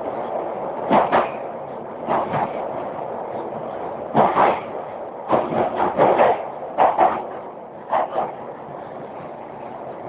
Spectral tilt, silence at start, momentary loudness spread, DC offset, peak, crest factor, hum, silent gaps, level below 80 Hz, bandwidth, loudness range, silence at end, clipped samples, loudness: -10 dB/octave; 0 s; 17 LU; under 0.1%; -2 dBFS; 20 dB; none; none; -56 dBFS; 4 kHz; 4 LU; 0 s; under 0.1%; -22 LUFS